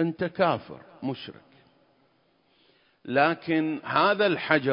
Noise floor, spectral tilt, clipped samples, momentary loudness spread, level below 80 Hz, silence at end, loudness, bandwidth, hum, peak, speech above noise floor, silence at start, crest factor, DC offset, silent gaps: -66 dBFS; -10 dB/octave; under 0.1%; 17 LU; -68 dBFS; 0 s; -25 LUFS; 5.4 kHz; none; -4 dBFS; 41 dB; 0 s; 22 dB; under 0.1%; none